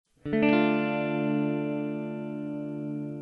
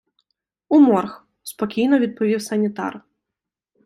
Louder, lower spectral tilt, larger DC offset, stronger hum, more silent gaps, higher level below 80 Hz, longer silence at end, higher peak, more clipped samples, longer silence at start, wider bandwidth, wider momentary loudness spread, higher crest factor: second, -28 LUFS vs -19 LUFS; first, -9 dB/octave vs -6 dB/octave; neither; neither; neither; about the same, -64 dBFS vs -66 dBFS; second, 0 s vs 0.85 s; second, -10 dBFS vs -4 dBFS; neither; second, 0.25 s vs 0.7 s; second, 5.6 kHz vs 14 kHz; second, 11 LU vs 17 LU; about the same, 18 dB vs 16 dB